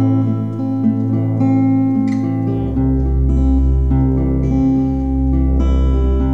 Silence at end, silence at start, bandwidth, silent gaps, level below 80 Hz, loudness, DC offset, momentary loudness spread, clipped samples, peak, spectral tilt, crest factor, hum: 0 s; 0 s; 3.9 kHz; none; -18 dBFS; -16 LUFS; 1%; 3 LU; under 0.1%; -4 dBFS; -10.5 dB/octave; 10 dB; none